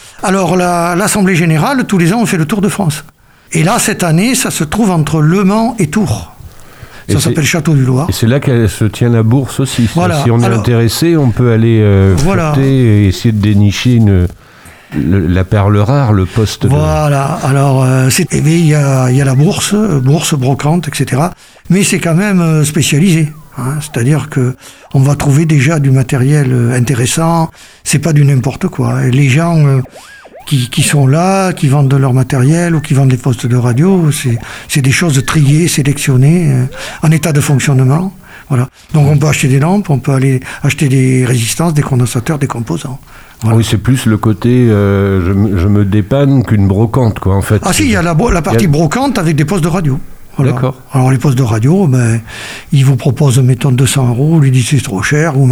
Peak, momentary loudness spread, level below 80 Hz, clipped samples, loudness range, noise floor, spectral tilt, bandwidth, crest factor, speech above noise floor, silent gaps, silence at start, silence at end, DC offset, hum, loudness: 0 dBFS; 6 LU; -32 dBFS; under 0.1%; 2 LU; -32 dBFS; -6 dB/octave; 16 kHz; 10 dB; 23 dB; none; 0.05 s; 0 s; 0.1%; none; -10 LUFS